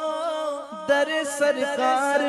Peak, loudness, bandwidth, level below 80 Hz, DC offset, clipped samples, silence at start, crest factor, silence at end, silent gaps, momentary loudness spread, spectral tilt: -10 dBFS; -24 LUFS; 12 kHz; -70 dBFS; under 0.1%; under 0.1%; 0 s; 14 dB; 0 s; none; 8 LU; -2 dB/octave